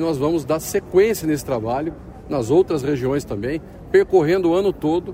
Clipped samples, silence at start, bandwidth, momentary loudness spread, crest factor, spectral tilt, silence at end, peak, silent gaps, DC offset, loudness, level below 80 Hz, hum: under 0.1%; 0 s; 16 kHz; 10 LU; 16 dB; -6 dB/octave; 0 s; -4 dBFS; none; under 0.1%; -20 LUFS; -44 dBFS; none